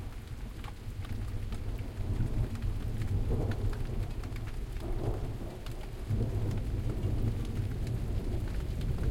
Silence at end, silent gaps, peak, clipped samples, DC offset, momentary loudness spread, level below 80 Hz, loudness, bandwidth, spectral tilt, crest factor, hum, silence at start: 0 s; none; -18 dBFS; under 0.1%; under 0.1%; 9 LU; -36 dBFS; -37 LUFS; 16 kHz; -7.5 dB/octave; 14 dB; none; 0 s